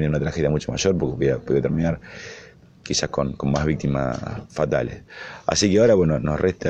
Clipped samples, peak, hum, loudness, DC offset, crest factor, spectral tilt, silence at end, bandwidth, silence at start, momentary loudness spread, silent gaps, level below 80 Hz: under 0.1%; -4 dBFS; none; -22 LUFS; under 0.1%; 18 dB; -5.5 dB/octave; 0 s; 8.8 kHz; 0 s; 19 LU; none; -40 dBFS